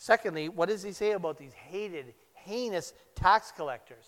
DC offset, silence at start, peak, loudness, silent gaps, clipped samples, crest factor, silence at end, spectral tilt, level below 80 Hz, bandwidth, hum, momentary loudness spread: under 0.1%; 0 s; -8 dBFS; -31 LUFS; none; under 0.1%; 22 dB; 0.15 s; -4.5 dB/octave; -54 dBFS; 16.5 kHz; none; 16 LU